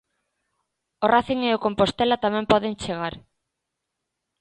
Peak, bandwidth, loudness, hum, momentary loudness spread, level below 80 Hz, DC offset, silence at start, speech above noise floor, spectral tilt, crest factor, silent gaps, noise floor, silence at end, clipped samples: -2 dBFS; 10.5 kHz; -22 LUFS; none; 8 LU; -52 dBFS; under 0.1%; 1 s; 60 dB; -5.5 dB/octave; 22 dB; none; -82 dBFS; 1.2 s; under 0.1%